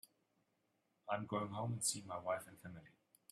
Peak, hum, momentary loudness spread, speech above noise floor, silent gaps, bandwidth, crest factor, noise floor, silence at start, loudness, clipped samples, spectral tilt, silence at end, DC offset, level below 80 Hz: -24 dBFS; none; 17 LU; 39 dB; none; 15 kHz; 22 dB; -83 dBFS; 1.05 s; -42 LUFS; under 0.1%; -4 dB/octave; 0.45 s; under 0.1%; -82 dBFS